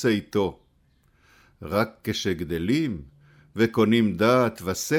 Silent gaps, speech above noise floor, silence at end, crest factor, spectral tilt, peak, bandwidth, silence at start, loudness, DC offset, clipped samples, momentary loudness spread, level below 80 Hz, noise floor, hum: none; 40 dB; 0 s; 16 dB; -5.5 dB/octave; -8 dBFS; 18.5 kHz; 0 s; -24 LUFS; under 0.1%; under 0.1%; 10 LU; -52 dBFS; -63 dBFS; none